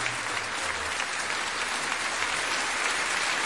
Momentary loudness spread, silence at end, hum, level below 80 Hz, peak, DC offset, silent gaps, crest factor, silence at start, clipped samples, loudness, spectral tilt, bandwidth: 3 LU; 0 s; none; -60 dBFS; -12 dBFS; 0.2%; none; 18 dB; 0 s; under 0.1%; -27 LUFS; 0 dB/octave; 11.5 kHz